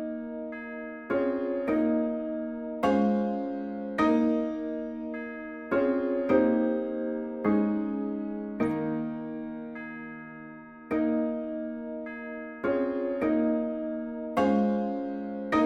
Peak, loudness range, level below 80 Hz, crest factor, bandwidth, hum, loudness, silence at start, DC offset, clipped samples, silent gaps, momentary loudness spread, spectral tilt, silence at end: -12 dBFS; 6 LU; -62 dBFS; 18 dB; 7.4 kHz; none; -29 LUFS; 0 s; under 0.1%; under 0.1%; none; 13 LU; -8 dB/octave; 0 s